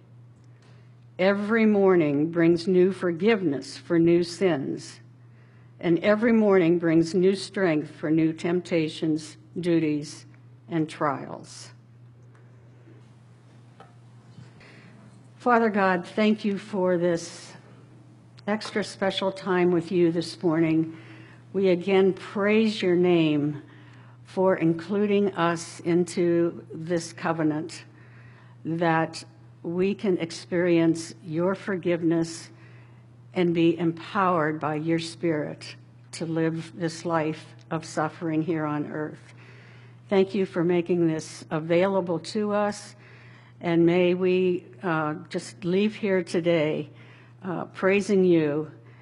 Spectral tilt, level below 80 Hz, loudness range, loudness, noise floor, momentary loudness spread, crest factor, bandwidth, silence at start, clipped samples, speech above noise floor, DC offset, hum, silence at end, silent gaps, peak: -6.5 dB/octave; -70 dBFS; 6 LU; -25 LUFS; -52 dBFS; 13 LU; 20 dB; 11.5 kHz; 1.2 s; under 0.1%; 27 dB; under 0.1%; none; 0.1 s; none; -6 dBFS